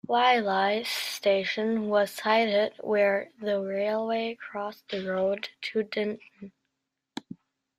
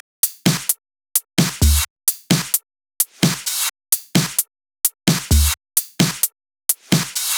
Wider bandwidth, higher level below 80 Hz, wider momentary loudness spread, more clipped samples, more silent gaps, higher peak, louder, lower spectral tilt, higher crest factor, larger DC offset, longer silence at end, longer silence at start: second, 15.5 kHz vs over 20 kHz; second, -74 dBFS vs -28 dBFS; first, 12 LU vs 5 LU; neither; second, none vs 1.90-1.96 s; second, -10 dBFS vs 0 dBFS; second, -27 LUFS vs -19 LUFS; about the same, -4 dB/octave vs -3 dB/octave; about the same, 18 dB vs 20 dB; neither; first, 0.45 s vs 0 s; second, 0.1 s vs 0.25 s